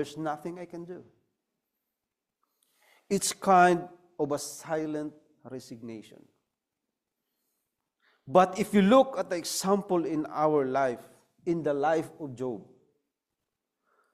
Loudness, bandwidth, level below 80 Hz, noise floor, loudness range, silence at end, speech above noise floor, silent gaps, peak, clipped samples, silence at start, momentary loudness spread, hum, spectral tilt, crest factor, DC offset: -27 LUFS; 15.5 kHz; -70 dBFS; -87 dBFS; 13 LU; 1.5 s; 60 dB; none; -6 dBFS; under 0.1%; 0 s; 21 LU; none; -5 dB/octave; 24 dB; under 0.1%